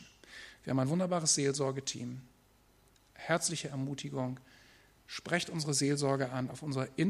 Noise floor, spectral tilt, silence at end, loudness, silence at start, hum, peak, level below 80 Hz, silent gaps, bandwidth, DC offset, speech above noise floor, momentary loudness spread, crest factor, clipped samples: -66 dBFS; -4 dB/octave; 0 s; -33 LUFS; 0 s; none; -14 dBFS; -70 dBFS; none; 14.5 kHz; under 0.1%; 33 dB; 18 LU; 20 dB; under 0.1%